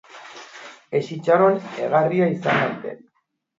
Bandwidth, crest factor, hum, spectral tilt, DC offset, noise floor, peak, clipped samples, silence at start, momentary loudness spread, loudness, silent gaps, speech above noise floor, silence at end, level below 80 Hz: 7.8 kHz; 18 dB; none; -7 dB/octave; under 0.1%; -71 dBFS; -4 dBFS; under 0.1%; 0.15 s; 22 LU; -20 LUFS; none; 51 dB; 0.65 s; -68 dBFS